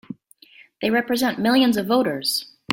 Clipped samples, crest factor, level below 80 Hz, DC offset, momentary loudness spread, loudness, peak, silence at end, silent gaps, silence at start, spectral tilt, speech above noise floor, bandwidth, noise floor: under 0.1%; 18 dB; -64 dBFS; under 0.1%; 9 LU; -21 LUFS; -4 dBFS; 0 s; none; 0.1 s; -4 dB/octave; 31 dB; 17 kHz; -51 dBFS